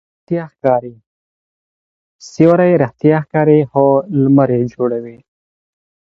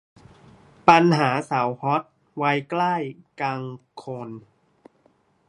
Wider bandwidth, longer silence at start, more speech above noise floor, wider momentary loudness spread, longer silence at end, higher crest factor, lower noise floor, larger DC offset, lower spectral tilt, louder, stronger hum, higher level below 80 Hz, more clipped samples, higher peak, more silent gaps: second, 7.6 kHz vs 11.5 kHz; second, 0.3 s vs 0.85 s; first, over 77 dB vs 41 dB; second, 11 LU vs 21 LU; second, 0.9 s vs 1.1 s; second, 14 dB vs 24 dB; first, under -90 dBFS vs -63 dBFS; neither; first, -9 dB/octave vs -6.5 dB/octave; first, -14 LUFS vs -22 LUFS; neither; first, -56 dBFS vs -66 dBFS; neither; about the same, 0 dBFS vs 0 dBFS; first, 1.06-2.19 s vs none